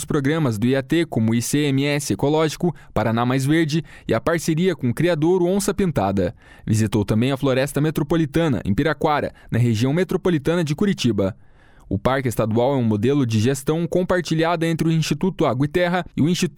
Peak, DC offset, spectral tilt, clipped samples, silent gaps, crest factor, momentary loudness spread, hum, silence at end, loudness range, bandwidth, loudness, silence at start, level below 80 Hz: -6 dBFS; under 0.1%; -6 dB/octave; under 0.1%; none; 14 dB; 4 LU; none; 0.05 s; 1 LU; 18 kHz; -20 LUFS; 0 s; -44 dBFS